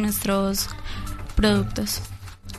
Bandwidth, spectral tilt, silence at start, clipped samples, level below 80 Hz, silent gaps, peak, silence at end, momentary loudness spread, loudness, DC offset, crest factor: 13.5 kHz; -4.5 dB/octave; 0 s; under 0.1%; -32 dBFS; none; -6 dBFS; 0 s; 13 LU; -24 LUFS; under 0.1%; 20 dB